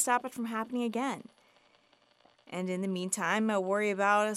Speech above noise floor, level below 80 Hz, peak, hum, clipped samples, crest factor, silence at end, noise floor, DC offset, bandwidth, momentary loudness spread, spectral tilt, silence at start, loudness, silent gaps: 36 dB; -84 dBFS; -14 dBFS; none; under 0.1%; 18 dB; 0 s; -67 dBFS; under 0.1%; 15.5 kHz; 9 LU; -4 dB/octave; 0 s; -31 LUFS; none